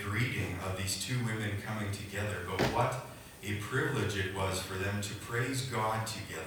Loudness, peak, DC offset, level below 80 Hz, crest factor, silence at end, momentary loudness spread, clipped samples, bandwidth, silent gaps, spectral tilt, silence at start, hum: -34 LUFS; -18 dBFS; under 0.1%; -58 dBFS; 18 dB; 0 s; 6 LU; under 0.1%; over 20 kHz; none; -4.5 dB/octave; 0 s; none